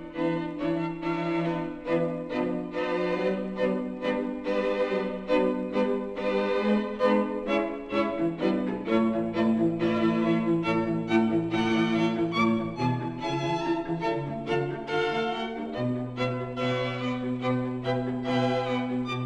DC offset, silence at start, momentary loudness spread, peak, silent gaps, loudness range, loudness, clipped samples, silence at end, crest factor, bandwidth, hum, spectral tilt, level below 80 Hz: under 0.1%; 0 s; 5 LU; -10 dBFS; none; 4 LU; -28 LUFS; under 0.1%; 0 s; 16 dB; 8.8 kHz; none; -7 dB/octave; -56 dBFS